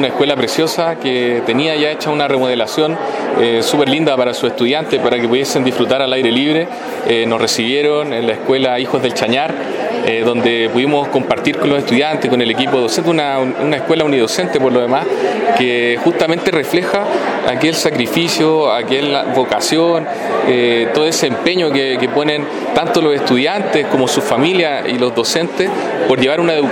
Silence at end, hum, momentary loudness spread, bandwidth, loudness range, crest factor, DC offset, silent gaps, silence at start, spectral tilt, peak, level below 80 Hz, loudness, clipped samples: 0 s; none; 4 LU; 17.5 kHz; 1 LU; 14 dB; under 0.1%; none; 0 s; -4 dB/octave; 0 dBFS; -56 dBFS; -14 LUFS; under 0.1%